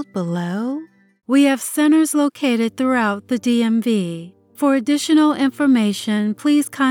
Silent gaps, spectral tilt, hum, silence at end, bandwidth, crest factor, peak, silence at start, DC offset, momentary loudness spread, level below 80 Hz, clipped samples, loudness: none; -5 dB/octave; none; 0 s; 17.5 kHz; 14 dB; -4 dBFS; 0 s; under 0.1%; 8 LU; -74 dBFS; under 0.1%; -18 LUFS